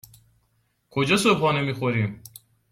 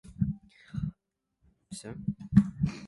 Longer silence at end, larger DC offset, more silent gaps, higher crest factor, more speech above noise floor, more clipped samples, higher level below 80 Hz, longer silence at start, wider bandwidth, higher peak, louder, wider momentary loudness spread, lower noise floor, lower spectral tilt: first, 0.55 s vs 0 s; neither; neither; about the same, 20 dB vs 24 dB; second, 47 dB vs 51 dB; neither; second, -60 dBFS vs -48 dBFS; first, 0.95 s vs 0.05 s; first, 16.5 kHz vs 11.5 kHz; about the same, -6 dBFS vs -8 dBFS; first, -23 LUFS vs -31 LUFS; second, 12 LU vs 18 LU; second, -69 dBFS vs -80 dBFS; second, -5 dB/octave vs -7.5 dB/octave